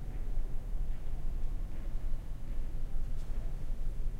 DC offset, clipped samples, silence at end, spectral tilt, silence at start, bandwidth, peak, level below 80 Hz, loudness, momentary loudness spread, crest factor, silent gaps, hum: under 0.1%; under 0.1%; 0 s; -7 dB/octave; 0 s; 3.1 kHz; -20 dBFS; -34 dBFS; -43 LUFS; 1 LU; 10 dB; none; none